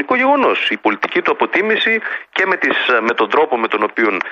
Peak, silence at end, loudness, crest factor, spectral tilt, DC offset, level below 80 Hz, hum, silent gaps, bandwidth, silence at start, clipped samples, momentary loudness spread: -2 dBFS; 0 s; -15 LUFS; 14 dB; -4.5 dB/octave; under 0.1%; -64 dBFS; none; none; 7.6 kHz; 0 s; under 0.1%; 4 LU